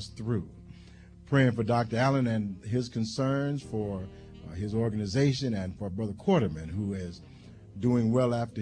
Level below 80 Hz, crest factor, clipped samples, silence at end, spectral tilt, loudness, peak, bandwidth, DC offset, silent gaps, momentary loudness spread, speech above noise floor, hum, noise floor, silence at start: -54 dBFS; 18 dB; under 0.1%; 0 s; -7 dB/octave; -29 LUFS; -12 dBFS; 10 kHz; under 0.1%; none; 15 LU; 22 dB; none; -51 dBFS; 0 s